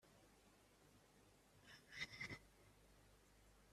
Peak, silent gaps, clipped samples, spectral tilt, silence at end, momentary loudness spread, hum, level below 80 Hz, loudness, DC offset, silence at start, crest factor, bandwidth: -36 dBFS; none; under 0.1%; -3 dB/octave; 0 s; 15 LU; 50 Hz at -75 dBFS; -78 dBFS; -53 LUFS; under 0.1%; 0 s; 26 dB; 14 kHz